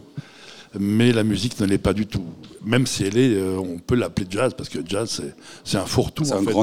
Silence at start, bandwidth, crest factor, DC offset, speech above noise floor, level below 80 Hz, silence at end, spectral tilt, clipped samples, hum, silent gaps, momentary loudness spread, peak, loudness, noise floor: 0 s; 16.5 kHz; 18 dB; 0.4%; 23 dB; -44 dBFS; 0 s; -5.5 dB/octave; under 0.1%; none; none; 17 LU; -4 dBFS; -22 LUFS; -44 dBFS